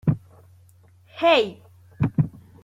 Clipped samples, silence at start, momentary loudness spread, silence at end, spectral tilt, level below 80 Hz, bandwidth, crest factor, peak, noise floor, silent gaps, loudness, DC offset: under 0.1%; 0.05 s; 13 LU; 0.35 s; -7.5 dB/octave; -52 dBFS; 8.8 kHz; 20 dB; -6 dBFS; -54 dBFS; none; -23 LUFS; under 0.1%